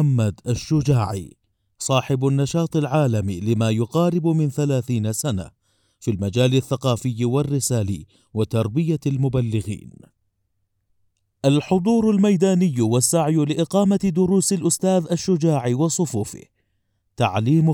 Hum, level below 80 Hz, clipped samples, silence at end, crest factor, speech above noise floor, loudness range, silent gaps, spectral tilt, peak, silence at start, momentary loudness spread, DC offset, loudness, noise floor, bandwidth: none; -52 dBFS; under 0.1%; 0 s; 16 dB; 52 dB; 5 LU; none; -6 dB/octave; -4 dBFS; 0 s; 9 LU; under 0.1%; -20 LUFS; -71 dBFS; 18.5 kHz